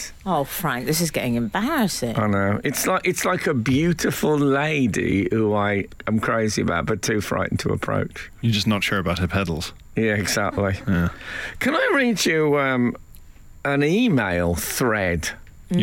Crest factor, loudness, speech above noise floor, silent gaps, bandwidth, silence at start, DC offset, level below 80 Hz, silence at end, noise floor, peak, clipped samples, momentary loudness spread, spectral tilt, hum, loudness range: 12 dB; -22 LUFS; 21 dB; none; 17 kHz; 0 s; under 0.1%; -44 dBFS; 0 s; -43 dBFS; -10 dBFS; under 0.1%; 7 LU; -5 dB/octave; none; 2 LU